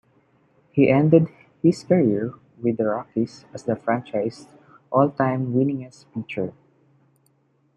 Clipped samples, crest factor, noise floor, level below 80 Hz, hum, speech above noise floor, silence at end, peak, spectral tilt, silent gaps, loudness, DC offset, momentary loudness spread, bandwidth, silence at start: under 0.1%; 20 dB; -64 dBFS; -64 dBFS; none; 43 dB; 1.25 s; -2 dBFS; -8.5 dB/octave; none; -22 LUFS; under 0.1%; 14 LU; 10 kHz; 0.75 s